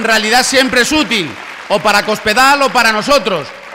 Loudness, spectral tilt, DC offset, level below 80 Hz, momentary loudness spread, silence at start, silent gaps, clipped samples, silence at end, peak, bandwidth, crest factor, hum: -11 LUFS; -2 dB/octave; under 0.1%; -42 dBFS; 9 LU; 0 s; none; under 0.1%; 0 s; -2 dBFS; 16.5 kHz; 10 dB; none